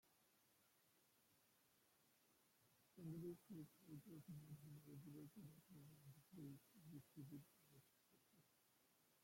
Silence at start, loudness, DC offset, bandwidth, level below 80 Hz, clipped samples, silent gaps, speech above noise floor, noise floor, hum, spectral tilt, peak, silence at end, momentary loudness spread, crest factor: 0.05 s; -61 LUFS; under 0.1%; 16.5 kHz; under -90 dBFS; under 0.1%; none; 19 dB; -81 dBFS; none; -6.5 dB/octave; -46 dBFS; 0 s; 9 LU; 18 dB